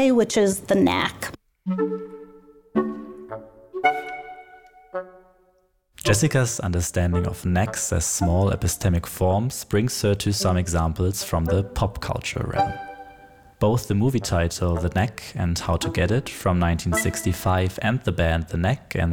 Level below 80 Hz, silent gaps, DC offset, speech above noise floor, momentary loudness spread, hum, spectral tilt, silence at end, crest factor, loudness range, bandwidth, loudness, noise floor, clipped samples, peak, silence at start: -38 dBFS; none; under 0.1%; 42 dB; 14 LU; none; -5 dB/octave; 0 s; 18 dB; 6 LU; 18.5 kHz; -23 LUFS; -64 dBFS; under 0.1%; -6 dBFS; 0 s